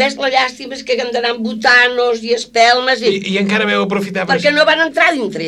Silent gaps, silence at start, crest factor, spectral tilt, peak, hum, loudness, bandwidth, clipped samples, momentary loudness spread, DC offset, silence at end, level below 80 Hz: none; 0 s; 14 dB; -3.5 dB/octave; 0 dBFS; none; -13 LUFS; 13 kHz; under 0.1%; 8 LU; under 0.1%; 0 s; -56 dBFS